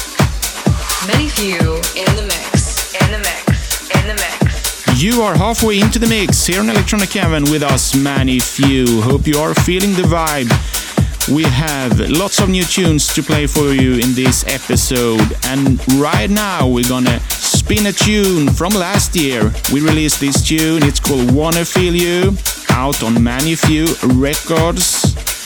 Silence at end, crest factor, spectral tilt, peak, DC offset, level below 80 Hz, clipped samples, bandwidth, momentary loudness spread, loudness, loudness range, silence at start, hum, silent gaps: 0 s; 14 dB; -4.5 dB/octave; 0 dBFS; under 0.1%; -24 dBFS; under 0.1%; over 20 kHz; 3 LU; -13 LUFS; 2 LU; 0 s; none; none